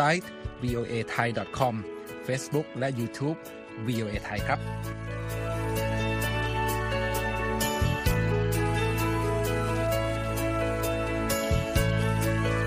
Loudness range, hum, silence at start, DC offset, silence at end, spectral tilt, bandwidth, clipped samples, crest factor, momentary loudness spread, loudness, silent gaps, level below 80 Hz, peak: 4 LU; none; 0 s; under 0.1%; 0 s; -5.5 dB/octave; 15.5 kHz; under 0.1%; 18 dB; 7 LU; -29 LUFS; none; -38 dBFS; -10 dBFS